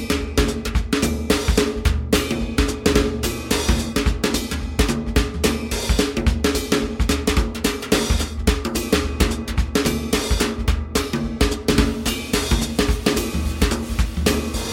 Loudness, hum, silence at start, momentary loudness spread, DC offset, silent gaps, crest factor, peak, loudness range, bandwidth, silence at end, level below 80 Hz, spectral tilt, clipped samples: -21 LUFS; none; 0 s; 4 LU; under 0.1%; none; 18 dB; -2 dBFS; 1 LU; 17 kHz; 0 s; -24 dBFS; -4.5 dB/octave; under 0.1%